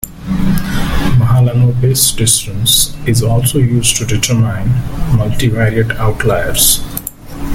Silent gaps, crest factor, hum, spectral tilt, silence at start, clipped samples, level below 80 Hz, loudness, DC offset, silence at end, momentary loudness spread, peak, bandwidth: none; 12 dB; none; -4 dB/octave; 0 s; under 0.1%; -24 dBFS; -12 LUFS; under 0.1%; 0 s; 7 LU; 0 dBFS; 17 kHz